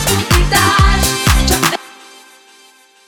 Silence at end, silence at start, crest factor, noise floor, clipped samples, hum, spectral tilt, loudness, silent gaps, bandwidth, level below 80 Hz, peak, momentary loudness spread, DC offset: 1.15 s; 0 s; 14 dB; -46 dBFS; under 0.1%; none; -3.5 dB/octave; -12 LUFS; none; over 20 kHz; -20 dBFS; 0 dBFS; 4 LU; under 0.1%